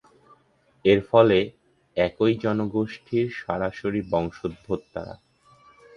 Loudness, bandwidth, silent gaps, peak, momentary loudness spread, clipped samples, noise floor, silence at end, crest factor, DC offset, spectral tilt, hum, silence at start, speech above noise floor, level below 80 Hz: -24 LUFS; 7 kHz; none; -2 dBFS; 15 LU; under 0.1%; -62 dBFS; 0.8 s; 24 dB; under 0.1%; -8 dB/octave; none; 0.85 s; 38 dB; -52 dBFS